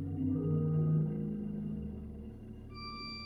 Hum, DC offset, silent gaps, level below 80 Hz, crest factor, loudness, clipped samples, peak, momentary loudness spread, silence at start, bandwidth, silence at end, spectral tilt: none; under 0.1%; none; -54 dBFS; 14 dB; -35 LUFS; under 0.1%; -22 dBFS; 16 LU; 0 s; 5 kHz; 0 s; -9.5 dB/octave